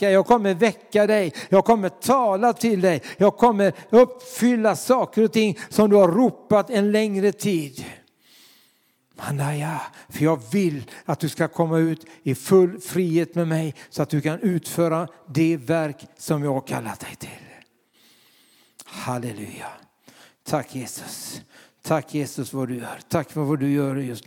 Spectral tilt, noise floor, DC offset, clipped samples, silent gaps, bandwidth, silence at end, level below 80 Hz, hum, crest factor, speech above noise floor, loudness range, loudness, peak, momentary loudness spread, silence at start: -6 dB/octave; -63 dBFS; under 0.1%; under 0.1%; none; 18 kHz; 0.05 s; -62 dBFS; none; 18 dB; 42 dB; 13 LU; -22 LUFS; -4 dBFS; 16 LU; 0 s